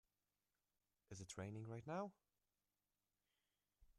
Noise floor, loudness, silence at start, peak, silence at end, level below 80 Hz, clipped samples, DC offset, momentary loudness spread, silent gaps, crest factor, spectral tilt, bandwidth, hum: under -90 dBFS; -53 LUFS; 1.1 s; -36 dBFS; 0.05 s; -82 dBFS; under 0.1%; under 0.1%; 9 LU; none; 20 dB; -5.5 dB/octave; 12 kHz; 50 Hz at -75 dBFS